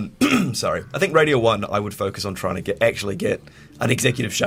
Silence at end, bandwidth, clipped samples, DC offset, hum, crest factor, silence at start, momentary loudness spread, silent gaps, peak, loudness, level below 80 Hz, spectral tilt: 0 s; 16 kHz; under 0.1%; under 0.1%; none; 18 dB; 0 s; 9 LU; none; -2 dBFS; -21 LUFS; -50 dBFS; -4.5 dB/octave